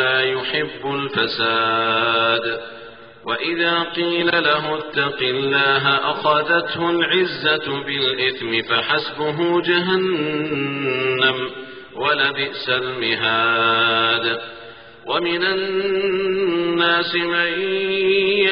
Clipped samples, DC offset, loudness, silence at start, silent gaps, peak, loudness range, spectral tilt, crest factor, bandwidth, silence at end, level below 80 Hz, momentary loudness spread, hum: under 0.1%; 0.1%; -19 LUFS; 0 s; none; -4 dBFS; 2 LU; -1 dB/octave; 16 dB; 5.4 kHz; 0 s; -58 dBFS; 7 LU; none